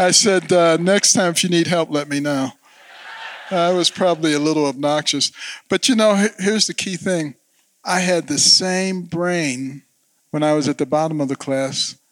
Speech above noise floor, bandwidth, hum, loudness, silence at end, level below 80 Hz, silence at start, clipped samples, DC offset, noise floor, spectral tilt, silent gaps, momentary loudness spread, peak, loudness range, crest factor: 26 dB; 17.5 kHz; none; -17 LUFS; 0.2 s; -70 dBFS; 0 s; under 0.1%; under 0.1%; -43 dBFS; -3 dB/octave; none; 11 LU; -2 dBFS; 3 LU; 18 dB